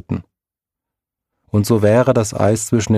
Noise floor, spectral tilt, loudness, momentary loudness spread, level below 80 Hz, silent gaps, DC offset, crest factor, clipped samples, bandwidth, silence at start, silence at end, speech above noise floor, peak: -88 dBFS; -6 dB/octave; -16 LUFS; 11 LU; -48 dBFS; none; under 0.1%; 16 dB; under 0.1%; 15.5 kHz; 0.1 s; 0 s; 73 dB; 0 dBFS